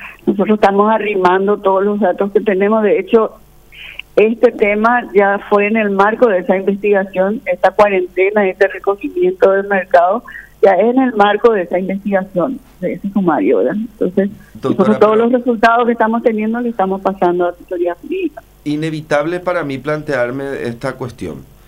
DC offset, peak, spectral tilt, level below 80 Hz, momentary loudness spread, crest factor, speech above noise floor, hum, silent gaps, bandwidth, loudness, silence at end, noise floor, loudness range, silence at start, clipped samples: under 0.1%; 0 dBFS; -7.5 dB/octave; -48 dBFS; 10 LU; 14 dB; 22 dB; none; none; 15.5 kHz; -14 LUFS; 0.25 s; -36 dBFS; 5 LU; 0 s; under 0.1%